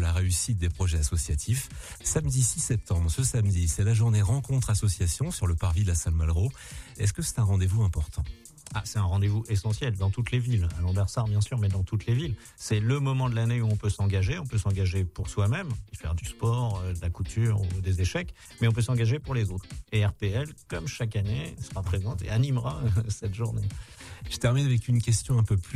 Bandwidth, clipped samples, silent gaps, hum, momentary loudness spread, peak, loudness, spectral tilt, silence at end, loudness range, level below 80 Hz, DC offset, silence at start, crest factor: 14.5 kHz; under 0.1%; none; none; 9 LU; -12 dBFS; -28 LUFS; -5.5 dB/octave; 0 s; 4 LU; -38 dBFS; under 0.1%; 0 s; 14 dB